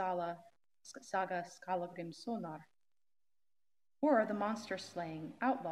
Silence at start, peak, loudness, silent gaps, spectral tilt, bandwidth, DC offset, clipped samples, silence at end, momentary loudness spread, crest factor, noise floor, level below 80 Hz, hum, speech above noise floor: 0 s; -18 dBFS; -39 LUFS; none; -5.5 dB/octave; 13.5 kHz; under 0.1%; under 0.1%; 0 s; 19 LU; 22 dB; under -90 dBFS; -88 dBFS; none; over 52 dB